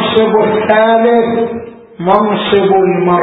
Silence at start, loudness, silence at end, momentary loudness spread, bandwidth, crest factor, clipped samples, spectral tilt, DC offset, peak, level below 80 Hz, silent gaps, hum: 0 s; -11 LUFS; 0 s; 8 LU; 4 kHz; 10 dB; under 0.1%; -4 dB/octave; under 0.1%; 0 dBFS; -48 dBFS; none; none